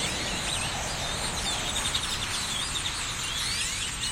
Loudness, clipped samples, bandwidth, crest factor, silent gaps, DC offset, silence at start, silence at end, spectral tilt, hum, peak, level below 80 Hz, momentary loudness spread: -28 LUFS; under 0.1%; 16.5 kHz; 16 dB; none; under 0.1%; 0 s; 0 s; -1.5 dB/octave; none; -14 dBFS; -42 dBFS; 2 LU